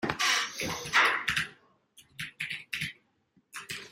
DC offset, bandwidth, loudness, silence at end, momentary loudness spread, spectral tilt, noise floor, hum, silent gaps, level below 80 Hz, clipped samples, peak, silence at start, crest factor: under 0.1%; 16 kHz; -29 LUFS; 0 s; 17 LU; -1.5 dB/octave; -70 dBFS; none; none; -64 dBFS; under 0.1%; -10 dBFS; 0 s; 22 dB